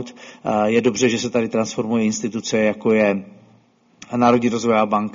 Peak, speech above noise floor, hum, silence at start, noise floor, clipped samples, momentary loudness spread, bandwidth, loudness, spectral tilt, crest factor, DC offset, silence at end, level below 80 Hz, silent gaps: -2 dBFS; 36 dB; none; 0 s; -55 dBFS; under 0.1%; 7 LU; 7.6 kHz; -19 LUFS; -4.5 dB/octave; 18 dB; under 0.1%; 0.05 s; -58 dBFS; none